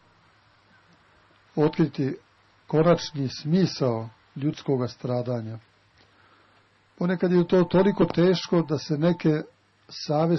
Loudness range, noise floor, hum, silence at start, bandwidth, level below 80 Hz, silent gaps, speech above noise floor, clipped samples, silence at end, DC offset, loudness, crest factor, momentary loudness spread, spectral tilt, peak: 6 LU; -61 dBFS; none; 1.55 s; 6.2 kHz; -58 dBFS; none; 38 dB; under 0.1%; 0 s; under 0.1%; -24 LUFS; 16 dB; 13 LU; -7.5 dB/octave; -10 dBFS